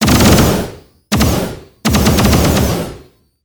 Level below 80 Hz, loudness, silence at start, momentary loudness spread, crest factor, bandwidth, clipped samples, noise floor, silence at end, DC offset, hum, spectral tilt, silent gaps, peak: -24 dBFS; -12 LUFS; 0 s; 13 LU; 12 dB; over 20 kHz; 0.1%; -41 dBFS; 0.45 s; under 0.1%; none; -5 dB/octave; none; 0 dBFS